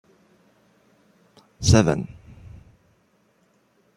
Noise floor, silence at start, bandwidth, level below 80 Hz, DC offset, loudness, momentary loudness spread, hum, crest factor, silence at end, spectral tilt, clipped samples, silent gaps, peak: -63 dBFS; 1.6 s; 15 kHz; -44 dBFS; under 0.1%; -20 LUFS; 29 LU; none; 24 dB; 1.85 s; -5.5 dB/octave; under 0.1%; none; -2 dBFS